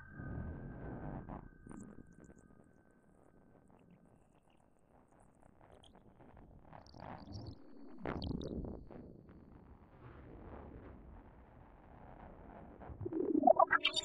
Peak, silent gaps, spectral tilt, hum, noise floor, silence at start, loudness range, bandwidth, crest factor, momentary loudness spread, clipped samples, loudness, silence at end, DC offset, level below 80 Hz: -14 dBFS; none; -5 dB/octave; none; -69 dBFS; 0 s; 22 LU; 10.5 kHz; 28 dB; 28 LU; under 0.1%; -38 LUFS; 0 s; under 0.1%; -58 dBFS